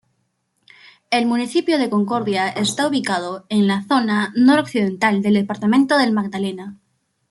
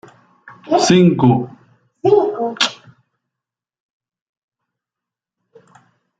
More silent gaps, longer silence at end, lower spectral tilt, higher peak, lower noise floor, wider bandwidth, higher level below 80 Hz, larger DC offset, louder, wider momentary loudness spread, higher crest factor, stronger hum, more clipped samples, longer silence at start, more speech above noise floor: neither; second, 0.55 s vs 3.45 s; about the same, -5 dB/octave vs -5.5 dB/octave; about the same, -2 dBFS vs -2 dBFS; second, -69 dBFS vs -86 dBFS; first, 12 kHz vs 9.2 kHz; second, -64 dBFS vs -58 dBFS; neither; second, -18 LUFS vs -15 LUFS; about the same, 8 LU vs 9 LU; about the same, 16 dB vs 18 dB; neither; neither; first, 1.1 s vs 0.45 s; second, 51 dB vs 73 dB